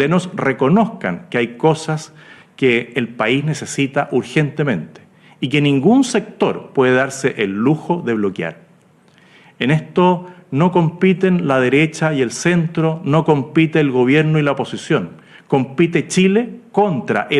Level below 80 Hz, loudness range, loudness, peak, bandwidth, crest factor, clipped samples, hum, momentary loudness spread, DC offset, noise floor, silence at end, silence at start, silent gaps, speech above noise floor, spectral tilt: -58 dBFS; 3 LU; -17 LUFS; -2 dBFS; 11.5 kHz; 14 dB; under 0.1%; none; 8 LU; under 0.1%; -51 dBFS; 0 s; 0 s; none; 35 dB; -6 dB/octave